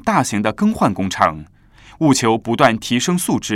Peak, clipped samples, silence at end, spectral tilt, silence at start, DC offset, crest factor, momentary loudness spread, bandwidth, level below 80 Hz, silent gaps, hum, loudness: 0 dBFS; under 0.1%; 0 s; -4.5 dB/octave; 0.05 s; under 0.1%; 18 dB; 4 LU; 17 kHz; -48 dBFS; none; none; -17 LUFS